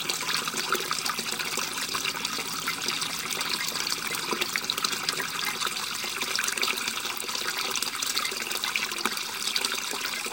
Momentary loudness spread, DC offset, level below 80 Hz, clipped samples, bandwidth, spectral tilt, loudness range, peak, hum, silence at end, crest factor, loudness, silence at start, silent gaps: 3 LU; under 0.1%; -70 dBFS; under 0.1%; 17.5 kHz; 0 dB/octave; 1 LU; -4 dBFS; none; 0 s; 26 dB; -27 LUFS; 0 s; none